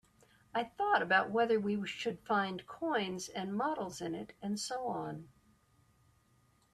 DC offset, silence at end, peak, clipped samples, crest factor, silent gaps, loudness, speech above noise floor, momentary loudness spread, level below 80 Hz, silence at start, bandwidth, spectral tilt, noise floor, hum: under 0.1%; 1.45 s; -16 dBFS; under 0.1%; 20 dB; none; -35 LUFS; 35 dB; 11 LU; -74 dBFS; 0.55 s; 13.5 kHz; -4.5 dB/octave; -70 dBFS; none